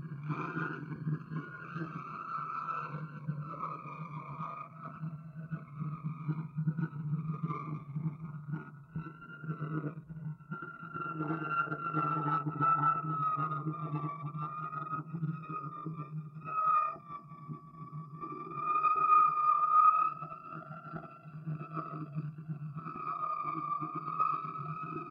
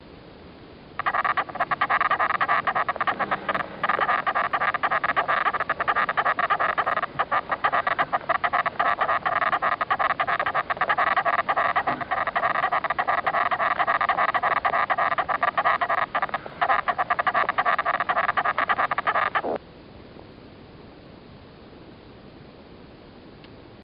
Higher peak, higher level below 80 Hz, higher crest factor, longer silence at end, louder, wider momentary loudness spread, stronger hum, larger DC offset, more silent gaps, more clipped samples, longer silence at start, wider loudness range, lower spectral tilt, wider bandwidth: second, -16 dBFS vs -8 dBFS; second, -74 dBFS vs -56 dBFS; about the same, 20 dB vs 18 dB; about the same, 0 s vs 0 s; second, -35 LUFS vs -23 LUFS; first, 16 LU vs 4 LU; neither; neither; neither; neither; about the same, 0 s vs 0 s; first, 12 LU vs 2 LU; first, -10 dB/octave vs -6 dB/octave; about the same, 5.2 kHz vs 5.4 kHz